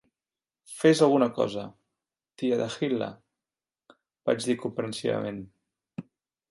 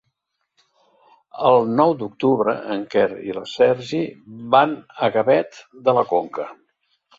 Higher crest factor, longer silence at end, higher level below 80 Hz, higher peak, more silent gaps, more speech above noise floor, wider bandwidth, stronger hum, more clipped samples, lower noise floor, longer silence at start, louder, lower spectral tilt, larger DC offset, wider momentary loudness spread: about the same, 22 dB vs 18 dB; second, 0.5 s vs 0.65 s; second, -70 dBFS vs -64 dBFS; second, -8 dBFS vs -2 dBFS; neither; first, over 64 dB vs 55 dB; first, 11.5 kHz vs 7.6 kHz; neither; neither; first, under -90 dBFS vs -75 dBFS; second, 0.7 s vs 1.35 s; second, -27 LUFS vs -20 LUFS; about the same, -5.5 dB/octave vs -6.5 dB/octave; neither; first, 22 LU vs 13 LU